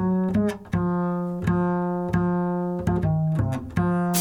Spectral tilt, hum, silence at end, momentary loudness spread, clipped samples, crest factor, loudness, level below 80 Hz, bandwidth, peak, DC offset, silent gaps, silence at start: -7 dB/octave; none; 0 s; 3 LU; under 0.1%; 14 dB; -24 LUFS; -42 dBFS; 18 kHz; -10 dBFS; under 0.1%; none; 0 s